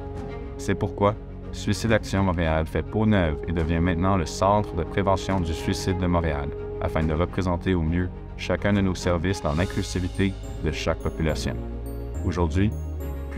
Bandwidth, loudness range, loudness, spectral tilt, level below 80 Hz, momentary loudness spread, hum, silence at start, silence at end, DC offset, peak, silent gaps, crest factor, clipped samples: 15.5 kHz; 4 LU; -25 LUFS; -6.5 dB/octave; -34 dBFS; 10 LU; none; 0 s; 0 s; under 0.1%; -6 dBFS; none; 18 dB; under 0.1%